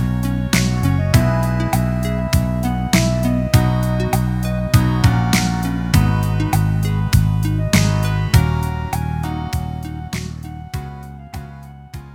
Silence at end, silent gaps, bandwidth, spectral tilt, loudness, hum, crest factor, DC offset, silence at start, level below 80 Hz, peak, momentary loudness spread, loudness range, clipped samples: 0 s; none; 17.5 kHz; -6 dB/octave; -18 LUFS; none; 16 dB; under 0.1%; 0 s; -26 dBFS; 0 dBFS; 14 LU; 5 LU; under 0.1%